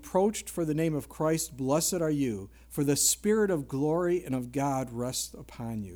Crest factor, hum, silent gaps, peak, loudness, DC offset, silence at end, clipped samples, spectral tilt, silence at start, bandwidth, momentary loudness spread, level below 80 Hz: 18 dB; none; none; -10 dBFS; -29 LUFS; under 0.1%; 0 s; under 0.1%; -4.5 dB/octave; 0 s; over 20 kHz; 11 LU; -54 dBFS